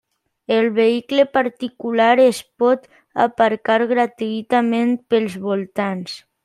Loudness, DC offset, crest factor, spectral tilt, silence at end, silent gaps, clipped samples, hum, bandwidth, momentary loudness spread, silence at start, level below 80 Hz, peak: -18 LUFS; under 0.1%; 16 dB; -5.5 dB/octave; 0.25 s; none; under 0.1%; none; 13.5 kHz; 9 LU; 0.5 s; -66 dBFS; -2 dBFS